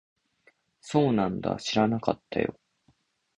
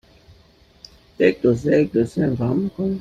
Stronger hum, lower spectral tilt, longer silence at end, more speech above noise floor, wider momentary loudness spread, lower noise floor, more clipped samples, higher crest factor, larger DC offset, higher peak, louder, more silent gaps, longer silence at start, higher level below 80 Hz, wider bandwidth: neither; second, -6 dB/octave vs -8 dB/octave; first, 0.85 s vs 0 s; first, 42 dB vs 34 dB; about the same, 6 LU vs 5 LU; first, -68 dBFS vs -53 dBFS; neither; about the same, 22 dB vs 18 dB; neither; about the same, -6 dBFS vs -4 dBFS; second, -27 LUFS vs -20 LUFS; neither; second, 0.85 s vs 1.2 s; second, -58 dBFS vs -50 dBFS; about the same, 10 kHz vs 9.6 kHz